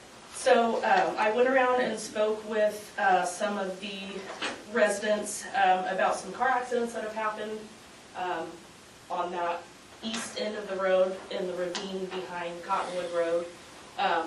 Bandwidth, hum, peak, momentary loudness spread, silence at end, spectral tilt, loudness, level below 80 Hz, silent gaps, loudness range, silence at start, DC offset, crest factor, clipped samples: 12.5 kHz; none; -10 dBFS; 14 LU; 0 s; -3 dB/octave; -29 LUFS; -70 dBFS; none; 8 LU; 0 s; under 0.1%; 20 dB; under 0.1%